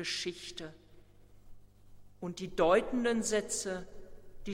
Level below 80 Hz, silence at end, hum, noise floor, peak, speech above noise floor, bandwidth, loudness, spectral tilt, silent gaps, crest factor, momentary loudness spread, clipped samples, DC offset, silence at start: -54 dBFS; 0 s; 50 Hz at -60 dBFS; -57 dBFS; -14 dBFS; 24 dB; 16.5 kHz; -33 LUFS; -3.5 dB/octave; none; 20 dB; 19 LU; under 0.1%; under 0.1%; 0 s